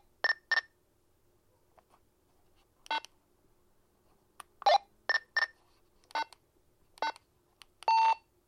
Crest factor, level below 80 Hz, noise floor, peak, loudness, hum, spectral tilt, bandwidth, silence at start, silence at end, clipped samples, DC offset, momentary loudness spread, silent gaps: 20 dB; -74 dBFS; -71 dBFS; -14 dBFS; -32 LUFS; none; 0 dB/octave; 14 kHz; 0.25 s; 0.3 s; under 0.1%; under 0.1%; 11 LU; none